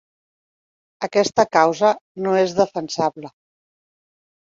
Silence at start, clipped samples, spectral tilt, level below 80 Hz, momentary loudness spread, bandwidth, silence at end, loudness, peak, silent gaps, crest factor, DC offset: 1 s; under 0.1%; -4.5 dB/octave; -64 dBFS; 9 LU; 7.8 kHz; 1.2 s; -19 LUFS; -2 dBFS; 2.01-2.15 s; 20 dB; under 0.1%